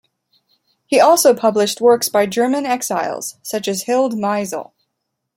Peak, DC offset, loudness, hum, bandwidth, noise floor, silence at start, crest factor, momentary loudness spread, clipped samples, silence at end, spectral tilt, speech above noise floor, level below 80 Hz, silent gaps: -2 dBFS; under 0.1%; -16 LUFS; none; 16.5 kHz; -75 dBFS; 0.9 s; 16 dB; 12 LU; under 0.1%; 0.75 s; -3 dB/octave; 60 dB; -66 dBFS; none